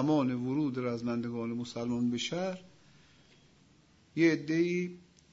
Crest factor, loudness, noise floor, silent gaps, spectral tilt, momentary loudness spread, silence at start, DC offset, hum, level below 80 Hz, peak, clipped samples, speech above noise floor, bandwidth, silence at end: 18 dB; -32 LUFS; -64 dBFS; none; -6 dB/octave; 9 LU; 0 s; under 0.1%; none; -72 dBFS; -14 dBFS; under 0.1%; 32 dB; 7.8 kHz; 0.35 s